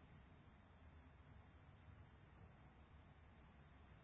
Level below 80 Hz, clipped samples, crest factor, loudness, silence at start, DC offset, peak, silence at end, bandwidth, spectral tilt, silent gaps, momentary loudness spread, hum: -70 dBFS; under 0.1%; 14 dB; -67 LUFS; 0 s; under 0.1%; -52 dBFS; 0 s; 3.8 kHz; -5 dB/octave; none; 2 LU; none